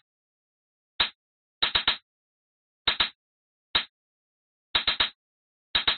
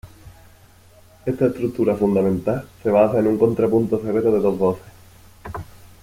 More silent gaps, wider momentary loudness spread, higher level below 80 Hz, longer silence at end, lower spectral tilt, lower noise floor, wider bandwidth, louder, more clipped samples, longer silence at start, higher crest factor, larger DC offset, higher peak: first, 1.15-1.61 s, 2.02-2.85 s, 3.15-3.74 s, 3.89-4.74 s, 5.15-5.74 s vs none; second, 5 LU vs 17 LU; about the same, -54 dBFS vs -50 dBFS; second, 0 s vs 0.15 s; second, 2.5 dB/octave vs -9 dB/octave; first, under -90 dBFS vs -49 dBFS; second, 4.7 kHz vs 16 kHz; second, -26 LUFS vs -20 LUFS; neither; first, 1 s vs 0.05 s; about the same, 22 dB vs 18 dB; neither; second, -8 dBFS vs -2 dBFS